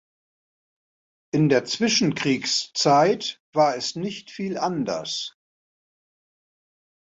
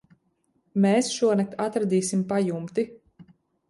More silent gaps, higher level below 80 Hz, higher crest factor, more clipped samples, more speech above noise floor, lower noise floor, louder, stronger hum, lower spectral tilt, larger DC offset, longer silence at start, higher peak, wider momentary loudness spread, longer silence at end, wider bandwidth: first, 3.40-3.53 s vs none; about the same, -66 dBFS vs -68 dBFS; about the same, 20 dB vs 16 dB; neither; first, over 68 dB vs 47 dB; first, under -90 dBFS vs -70 dBFS; about the same, -23 LUFS vs -25 LUFS; neither; second, -4 dB/octave vs -5.5 dB/octave; neither; first, 1.35 s vs 0.75 s; first, -6 dBFS vs -10 dBFS; first, 12 LU vs 8 LU; first, 1.75 s vs 0.75 s; second, 8.2 kHz vs 11.5 kHz